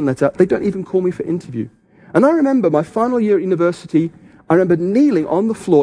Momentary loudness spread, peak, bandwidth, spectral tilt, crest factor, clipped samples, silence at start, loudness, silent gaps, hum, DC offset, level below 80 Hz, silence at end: 9 LU; 0 dBFS; 10.5 kHz; -8 dB/octave; 16 dB; under 0.1%; 0 s; -16 LUFS; none; none; under 0.1%; -54 dBFS; 0 s